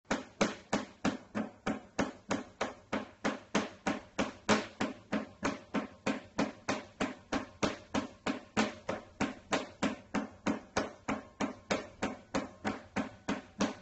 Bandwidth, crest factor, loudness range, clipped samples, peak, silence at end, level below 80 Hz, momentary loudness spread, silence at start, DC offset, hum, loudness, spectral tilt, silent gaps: 8.4 kHz; 22 dB; 2 LU; under 0.1%; -14 dBFS; 0 s; -62 dBFS; 6 LU; 0.1 s; under 0.1%; none; -37 LUFS; -4.5 dB/octave; none